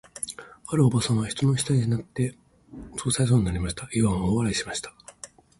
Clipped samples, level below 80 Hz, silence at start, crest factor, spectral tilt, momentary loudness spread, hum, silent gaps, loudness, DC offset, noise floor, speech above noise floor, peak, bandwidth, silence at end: under 0.1%; -44 dBFS; 0.15 s; 18 dB; -5.5 dB/octave; 19 LU; none; none; -25 LUFS; under 0.1%; -48 dBFS; 24 dB; -8 dBFS; 12 kHz; 0.35 s